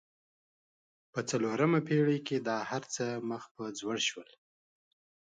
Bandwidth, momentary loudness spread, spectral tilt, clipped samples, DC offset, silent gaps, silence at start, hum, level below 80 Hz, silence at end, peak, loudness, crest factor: 9.6 kHz; 12 LU; -5 dB/octave; under 0.1%; under 0.1%; 3.51-3.55 s; 1.15 s; none; -80 dBFS; 1.05 s; -16 dBFS; -33 LUFS; 18 dB